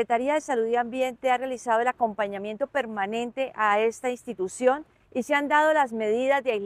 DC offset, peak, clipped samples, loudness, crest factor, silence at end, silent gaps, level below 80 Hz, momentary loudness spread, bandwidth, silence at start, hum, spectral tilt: under 0.1%; -8 dBFS; under 0.1%; -26 LUFS; 16 dB; 0 s; none; -68 dBFS; 9 LU; 15 kHz; 0 s; none; -4 dB/octave